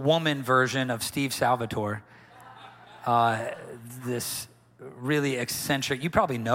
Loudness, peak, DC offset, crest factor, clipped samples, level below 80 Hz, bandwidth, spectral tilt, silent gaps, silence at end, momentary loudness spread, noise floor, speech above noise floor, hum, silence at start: -27 LUFS; -8 dBFS; under 0.1%; 20 dB; under 0.1%; -58 dBFS; 16.5 kHz; -4.5 dB/octave; none; 0 s; 21 LU; -49 dBFS; 23 dB; none; 0 s